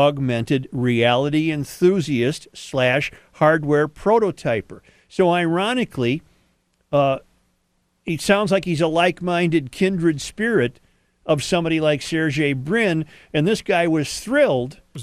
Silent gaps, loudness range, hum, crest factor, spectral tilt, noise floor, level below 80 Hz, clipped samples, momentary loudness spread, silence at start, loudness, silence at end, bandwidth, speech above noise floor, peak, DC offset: none; 3 LU; none; 18 dB; -5.5 dB/octave; -67 dBFS; -50 dBFS; under 0.1%; 8 LU; 0 s; -20 LUFS; 0 s; 14 kHz; 48 dB; -2 dBFS; under 0.1%